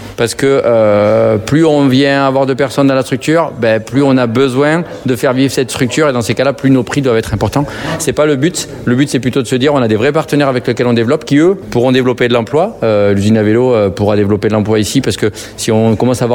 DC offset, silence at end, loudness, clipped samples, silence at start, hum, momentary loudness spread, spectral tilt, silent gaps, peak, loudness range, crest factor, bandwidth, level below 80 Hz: under 0.1%; 0 s; -11 LUFS; under 0.1%; 0 s; none; 5 LU; -6 dB/octave; none; 0 dBFS; 2 LU; 10 dB; 18 kHz; -42 dBFS